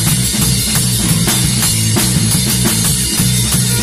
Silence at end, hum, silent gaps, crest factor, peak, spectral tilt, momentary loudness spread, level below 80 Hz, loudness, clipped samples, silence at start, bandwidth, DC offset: 0 s; none; none; 12 dB; 0 dBFS; -3 dB/octave; 1 LU; -28 dBFS; -12 LUFS; under 0.1%; 0 s; 16 kHz; under 0.1%